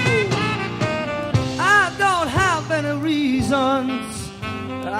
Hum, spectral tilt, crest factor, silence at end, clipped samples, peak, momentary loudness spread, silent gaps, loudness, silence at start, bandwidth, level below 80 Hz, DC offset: none; -5 dB/octave; 16 dB; 0 s; under 0.1%; -4 dBFS; 12 LU; none; -20 LUFS; 0 s; 15.5 kHz; -44 dBFS; under 0.1%